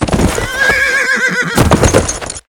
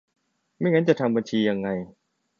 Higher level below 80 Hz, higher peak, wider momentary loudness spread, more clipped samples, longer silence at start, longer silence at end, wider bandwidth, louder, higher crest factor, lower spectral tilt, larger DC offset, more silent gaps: first, -22 dBFS vs -64 dBFS; first, 0 dBFS vs -6 dBFS; second, 4 LU vs 11 LU; first, 0.4% vs under 0.1%; second, 0 s vs 0.6 s; second, 0.1 s vs 0.55 s; first, 19.5 kHz vs 7.4 kHz; first, -11 LUFS vs -24 LUFS; second, 12 dB vs 20 dB; second, -4 dB/octave vs -7 dB/octave; neither; neither